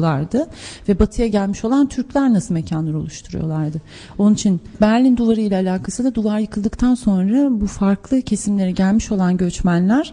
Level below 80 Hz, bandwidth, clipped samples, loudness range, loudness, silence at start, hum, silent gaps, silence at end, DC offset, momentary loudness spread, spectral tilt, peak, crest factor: -34 dBFS; 10.5 kHz; under 0.1%; 2 LU; -18 LUFS; 0 s; none; none; 0 s; under 0.1%; 8 LU; -6.5 dB/octave; -2 dBFS; 16 dB